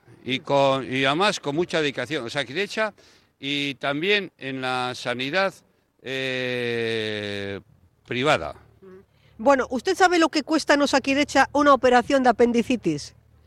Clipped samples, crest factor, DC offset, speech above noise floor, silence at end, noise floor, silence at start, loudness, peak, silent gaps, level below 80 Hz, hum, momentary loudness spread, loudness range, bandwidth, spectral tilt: under 0.1%; 18 dB; under 0.1%; 28 dB; 0.35 s; -50 dBFS; 0.25 s; -22 LUFS; -6 dBFS; none; -56 dBFS; none; 11 LU; 7 LU; 13 kHz; -4 dB/octave